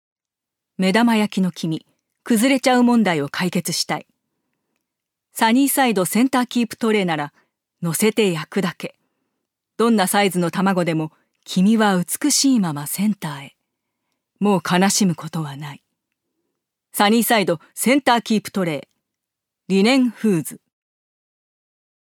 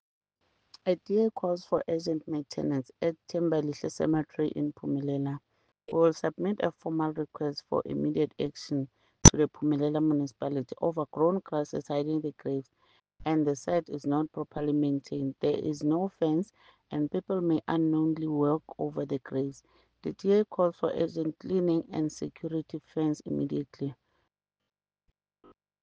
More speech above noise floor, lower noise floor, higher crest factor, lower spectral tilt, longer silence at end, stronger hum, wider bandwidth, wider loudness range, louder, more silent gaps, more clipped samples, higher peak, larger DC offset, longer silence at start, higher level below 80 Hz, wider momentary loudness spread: first, 67 dB vs 50 dB; first, -85 dBFS vs -80 dBFS; second, 20 dB vs 28 dB; about the same, -4.5 dB/octave vs -5.5 dB/octave; second, 1.65 s vs 1.9 s; neither; first, 19 kHz vs 10 kHz; about the same, 4 LU vs 6 LU; first, -19 LUFS vs -30 LUFS; neither; neither; about the same, 0 dBFS vs -2 dBFS; neither; about the same, 0.8 s vs 0.85 s; second, -72 dBFS vs -48 dBFS; first, 13 LU vs 8 LU